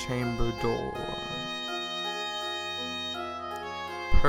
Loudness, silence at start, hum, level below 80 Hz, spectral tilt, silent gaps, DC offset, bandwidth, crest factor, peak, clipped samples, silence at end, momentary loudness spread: -32 LUFS; 0 s; none; -36 dBFS; -4.5 dB/octave; none; under 0.1%; 17 kHz; 20 dB; -8 dBFS; under 0.1%; 0 s; 5 LU